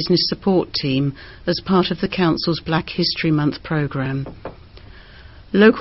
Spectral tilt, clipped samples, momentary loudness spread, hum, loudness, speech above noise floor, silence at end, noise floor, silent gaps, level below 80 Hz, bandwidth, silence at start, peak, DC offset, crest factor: -8 dB/octave; under 0.1%; 9 LU; none; -20 LUFS; 23 dB; 0 s; -42 dBFS; none; -44 dBFS; 6 kHz; 0 s; 0 dBFS; 0.2%; 18 dB